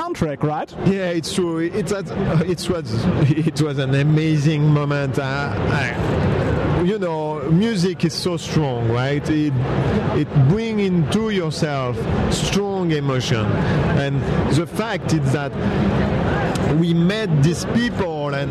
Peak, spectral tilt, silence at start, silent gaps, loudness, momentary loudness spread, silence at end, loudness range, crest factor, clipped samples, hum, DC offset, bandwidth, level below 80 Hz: -4 dBFS; -6.5 dB/octave; 0 s; none; -20 LUFS; 5 LU; 0 s; 1 LU; 14 dB; under 0.1%; none; under 0.1%; 13 kHz; -36 dBFS